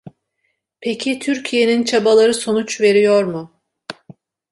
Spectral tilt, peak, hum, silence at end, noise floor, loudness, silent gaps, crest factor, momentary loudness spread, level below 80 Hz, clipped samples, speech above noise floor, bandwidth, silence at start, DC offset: -4 dB/octave; -2 dBFS; none; 0.6 s; -70 dBFS; -16 LUFS; none; 14 dB; 21 LU; -64 dBFS; under 0.1%; 55 dB; 11.5 kHz; 0.05 s; under 0.1%